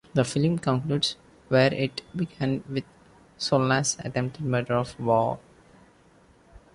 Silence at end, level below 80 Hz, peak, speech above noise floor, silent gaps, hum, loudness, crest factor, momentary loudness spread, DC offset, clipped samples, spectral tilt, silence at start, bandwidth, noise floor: 0.15 s; -58 dBFS; -8 dBFS; 32 dB; none; none; -26 LUFS; 18 dB; 10 LU; under 0.1%; under 0.1%; -5 dB/octave; 0.15 s; 11.5 kHz; -57 dBFS